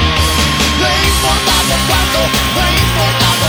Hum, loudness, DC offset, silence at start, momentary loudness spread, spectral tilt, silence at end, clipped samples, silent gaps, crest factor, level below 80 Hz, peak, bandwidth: none; -11 LUFS; under 0.1%; 0 s; 1 LU; -3 dB/octave; 0 s; under 0.1%; none; 12 dB; -20 dBFS; 0 dBFS; 17.5 kHz